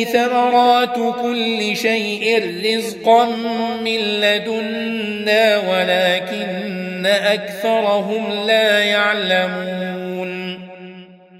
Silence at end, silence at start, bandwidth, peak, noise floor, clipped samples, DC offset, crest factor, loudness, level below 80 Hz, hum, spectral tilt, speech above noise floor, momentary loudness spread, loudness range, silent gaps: 0 s; 0 s; 16 kHz; -2 dBFS; -40 dBFS; under 0.1%; under 0.1%; 16 dB; -17 LUFS; -66 dBFS; none; -4 dB/octave; 23 dB; 11 LU; 1 LU; none